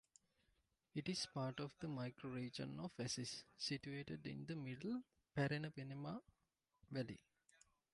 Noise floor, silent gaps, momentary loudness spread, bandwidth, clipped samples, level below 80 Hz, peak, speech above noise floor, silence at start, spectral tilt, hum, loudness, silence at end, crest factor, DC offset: -88 dBFS; none; 7 LU; 11.5 kHz; under 0.1%; -78 dBFS; -30 dBFS; 40 dB; 0.95 s; -5 dB/octave; none; -48 LUFS; 0.75 s; 20 dB; under 0.1%